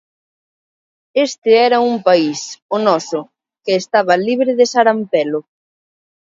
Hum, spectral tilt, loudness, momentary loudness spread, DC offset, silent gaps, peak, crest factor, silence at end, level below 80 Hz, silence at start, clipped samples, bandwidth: none; -4 dB/octave; -15 LUFS; 11 LU; under 0.1%; 1.38-1.42 s, 2.62-2.69 s; 0 dBFS; 16 dB; 0.9 s; -70 dBFS; 1.15 s; under 0.1%; 7.8 kHz